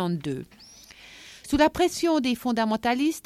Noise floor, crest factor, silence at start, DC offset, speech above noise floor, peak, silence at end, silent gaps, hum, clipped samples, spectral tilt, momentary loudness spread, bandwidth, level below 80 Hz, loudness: -48 dBFS; 18 dB; 0 s; under 0.1%; 24 dB; -8 dBFS; 0.05 s; none; none; under 0.1%; -5 dB/octave; 22 LU; 15.5 kHz; -50 dBFS; -24 LUFS